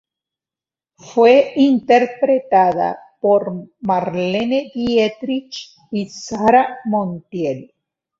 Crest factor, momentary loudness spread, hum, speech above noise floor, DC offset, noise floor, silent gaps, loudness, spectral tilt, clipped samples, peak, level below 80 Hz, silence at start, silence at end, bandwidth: 16 dB; 13 LU; none; over 74 dB; under 0.1%; under -90 dBFS; none; -17 LUFS; -6 dB/octave; under 0.1%; -2 dBFS; -58 dBFS; 1.05 s; 0.55 s; 7.6 kHz